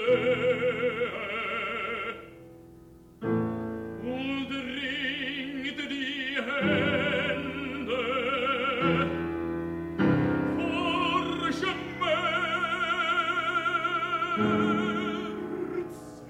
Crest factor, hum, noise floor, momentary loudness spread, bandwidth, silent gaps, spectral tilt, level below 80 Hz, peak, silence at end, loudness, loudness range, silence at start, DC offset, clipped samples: 16 dB; none; -51 dBFS; 8 LU; 15.5 kHz; none; -6 dB/octave; -60 dBFS; -14 dBFS; 0 s; -28 LUFS; 6 LU; 0 s; under 0.1%; under 0.1%